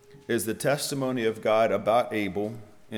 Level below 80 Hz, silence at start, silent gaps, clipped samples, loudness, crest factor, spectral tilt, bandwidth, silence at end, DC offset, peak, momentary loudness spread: -66 dBFS; 0.1 s; none; under 0.1%; -26 LUFS; 16 dB; -4.5 dB/octave; over 20 kHz; 0 s; under 0.1%; -10 dBFS; 9 LU